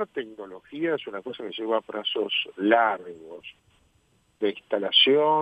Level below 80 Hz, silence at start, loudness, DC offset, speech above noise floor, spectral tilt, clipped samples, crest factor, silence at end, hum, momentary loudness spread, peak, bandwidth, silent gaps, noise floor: -74 dBFS; 0 s; -24 LUFS; under 0.1%; 40 dB; -5.5 dB/octave; under 0.1%; 22 dB; 0 s; none; 23 LU; -4 dBFS; 8.4 kHz; none; -65 dBFS